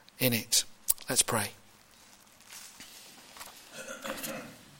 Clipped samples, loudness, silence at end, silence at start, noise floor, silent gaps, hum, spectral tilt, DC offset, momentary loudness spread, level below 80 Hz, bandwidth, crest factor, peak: under 0.1%; -29 LUFS; 0.05 s; 0.2 s; -58 dBFS; none; none; -2 dB/octave; under 0.1%; 21 LU; -64 dBFS; 17 kHz; 28 dB; -8 dBFS